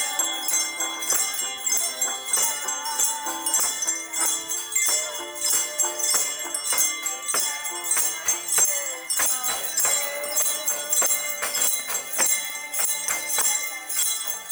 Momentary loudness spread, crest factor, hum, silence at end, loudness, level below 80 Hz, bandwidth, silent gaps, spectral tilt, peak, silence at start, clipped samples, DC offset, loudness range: 5 LU; 18 dB; none; 0 s; -22 LUFS; -72 dBFS; over 20 kHz; none; 2.5 dB/octave; -8 dBFS; 0 s; under 0.1%; under 0.1%; 1 LU